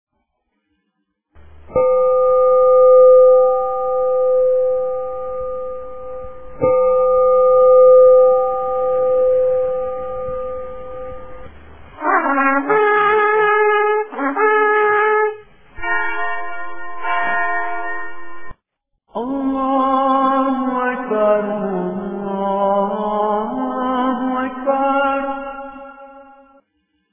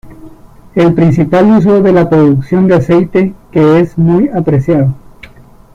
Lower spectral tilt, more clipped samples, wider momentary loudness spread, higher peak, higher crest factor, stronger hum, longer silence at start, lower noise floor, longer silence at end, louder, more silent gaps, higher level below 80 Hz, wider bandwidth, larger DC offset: about the same, -9 dB/octave vs -9.5 dB/octave; neither; first, 19 LU vs 6 LU; about the same, -2 dBFS vs 0 dBFS; about the same, 14 dB vs 10 dB; neither; first, 1.4 s vs 0.05 s; first, -72 dBFS vs -36 dBFS; first, 0.9 s vs 0.75 s; second, -16 LUFS vs -9 LUFS; neither; second, -48 dBFS vs -38 dBFS; second, 3.6 kHz vs 7.4 kHz; neither